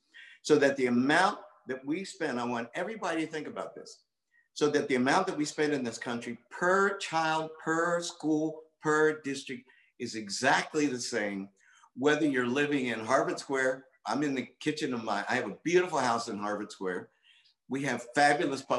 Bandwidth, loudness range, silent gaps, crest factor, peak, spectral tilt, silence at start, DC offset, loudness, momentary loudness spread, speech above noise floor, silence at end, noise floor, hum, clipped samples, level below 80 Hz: 12 kHz; 3 LU; none; 20 dB; -10 dBFS; -4 dB/octave; 0.15 s; under 0.1%; -30 LUFS; 13 LU; 36 dB; 0 s; -66 dBFS; none; under 0.1%; -80 dBFS